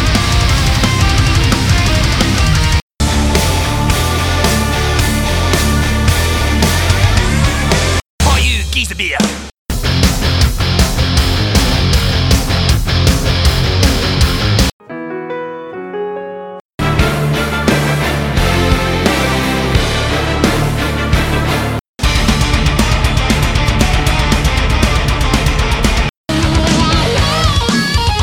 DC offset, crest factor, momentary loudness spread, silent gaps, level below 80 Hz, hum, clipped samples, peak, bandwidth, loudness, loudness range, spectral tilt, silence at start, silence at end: under 0.1%; 12 dB; 5 LU; 2.82-2.90 s, 8.09-8.18 s, 9.58-9.66 s, 14.73-14.80 s, 16.61-16.78 s, 21.88-21.94 s, 26.17-26.24 s; -18 dBFS; none; under 0.1%; 0 dBFS; 19 kHz; -13 LUFS; 3 LU; -4.5 dB/octave; 0 s; 0 s